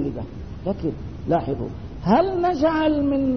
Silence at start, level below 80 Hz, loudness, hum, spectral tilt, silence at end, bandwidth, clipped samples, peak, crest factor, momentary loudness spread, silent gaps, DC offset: 0 s; -40 dBFS; -23 LUFS; none; -8.5 dB/octave; 0 s; 6.4 kHz; under 0.1%; -4 dBFS; 18 dB; 13 LU; none; 0.6%